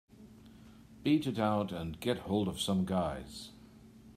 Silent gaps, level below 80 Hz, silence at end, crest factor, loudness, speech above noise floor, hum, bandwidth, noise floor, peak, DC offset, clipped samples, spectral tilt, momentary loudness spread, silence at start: none; -60 dBFS; 0.05 s; 18 dB; -34 LUFS; 23 dB; none; 15.5 kHz; -56 dBFS; -16 dBFS; under 0.1%; under 0.1%; -6 dB/octave; 14 LU; 0.2 s